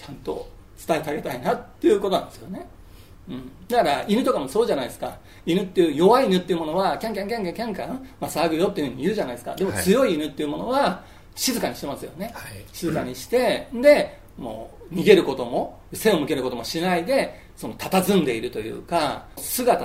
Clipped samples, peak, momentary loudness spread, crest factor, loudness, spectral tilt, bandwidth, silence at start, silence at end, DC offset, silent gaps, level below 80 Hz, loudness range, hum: under 0.1%; 0 dBFS; 17 LU; 22 dB; -23 LUFS; -5 dB/octave; 16 kHz; 0 s; 0 s; 0.2%; none; -50 dBFS; 4 LU; none